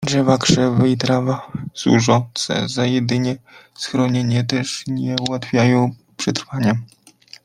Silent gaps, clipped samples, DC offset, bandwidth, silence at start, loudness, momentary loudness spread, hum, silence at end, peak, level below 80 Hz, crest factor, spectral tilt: none; under 0.1%; under 0.1%; 12 kHz; 0 s; -18 LUFS; 9 LU; none; 0.6 s; 0 dBFS; -54 dBFS; 18 dB; -5.5 dB/octave